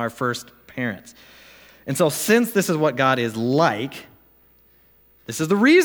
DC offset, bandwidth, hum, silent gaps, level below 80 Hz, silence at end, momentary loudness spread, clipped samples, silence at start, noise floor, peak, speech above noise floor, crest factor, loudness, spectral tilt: under 0.1%; over 20 kHz; none; none; -64 dBFS; 0 s; 15 LU; under 0.1%; 0 s; -56 dBFS; -4 dBFS; 36 dB; 18 dB; -21 LUFS; -5 dB/octave